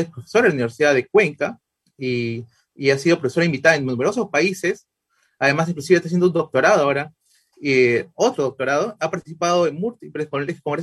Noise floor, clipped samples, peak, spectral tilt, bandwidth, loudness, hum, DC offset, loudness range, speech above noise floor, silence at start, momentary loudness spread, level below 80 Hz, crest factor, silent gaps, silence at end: -67 dBFS; under 0.1%; -2 dBFS; -5.5 dB/octave; 12.5 kHz; -20 LUFS; none; under 0.1%; 2 LU; 48 dB; 0 s; 11 LU; -64 dBFS; 18 dB; none; 0 s